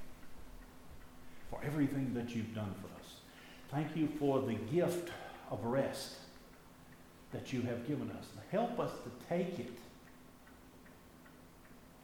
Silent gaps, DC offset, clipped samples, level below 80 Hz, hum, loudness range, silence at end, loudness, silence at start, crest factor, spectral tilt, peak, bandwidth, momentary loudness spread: none; under 0.1%; under 0.1%; -64 dBFS; none; 4 LU; 0 s; -39 LUFS; 0 s; 20 dB; -6.5 dB/octave; -20 dBFS; over 20 kHz; 23 LU